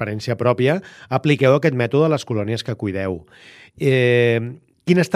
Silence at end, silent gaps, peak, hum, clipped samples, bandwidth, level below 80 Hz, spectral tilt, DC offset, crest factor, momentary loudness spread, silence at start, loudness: 0 s; none; -2 dBFS; none; under 0.1%; 13 kHz; -58 dBFS; -7 dB/octave; under 0.1%; 16 dB; 10 LU; 0 s; -19 LUFS